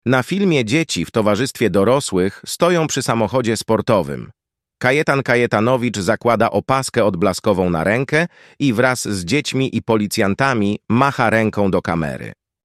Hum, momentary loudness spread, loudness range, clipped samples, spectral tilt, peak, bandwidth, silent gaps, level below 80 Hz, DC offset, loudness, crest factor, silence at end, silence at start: none; 5 LU; 1 LU; under 0.1%; -5 dB/octave; -2 dBFS; 14.5 kHz; none; -48 dBFS; under 0.1%; -17 LUFS; 16 dB; 0.35 s; 0.05 s